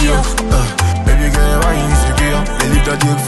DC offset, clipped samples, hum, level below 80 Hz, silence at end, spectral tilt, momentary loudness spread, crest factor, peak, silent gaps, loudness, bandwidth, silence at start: under 0.1%; under 0.1%; none; -14 dBFS; 0 s; -4.5 dB/octave; 2 LU; 12 dB; 0 dBFS; none; -14 LUFS; 12.5 kHz; 0 s